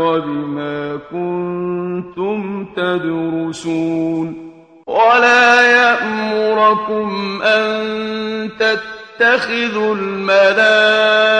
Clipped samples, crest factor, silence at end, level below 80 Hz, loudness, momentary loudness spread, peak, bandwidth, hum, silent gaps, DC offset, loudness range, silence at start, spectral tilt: under 0.1%; 16 dB; 0 s; -58 dBFS; -15 LUFS; 13 LU; 0 dBFS; 10 kHz; none; none; under 0.1%; 8 LU; 0 s; -4.5 dB/octave